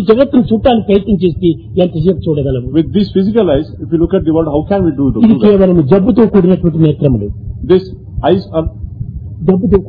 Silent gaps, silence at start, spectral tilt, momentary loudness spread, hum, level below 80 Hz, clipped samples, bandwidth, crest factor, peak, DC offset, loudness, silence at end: none; 0 s; -11.5 dB/octave; 10 LU; none; -28 dBFS; 0.4%; 5 kHz; 10 dB; 0 dBFS; under 0.1%; -11 LUFS; 0 s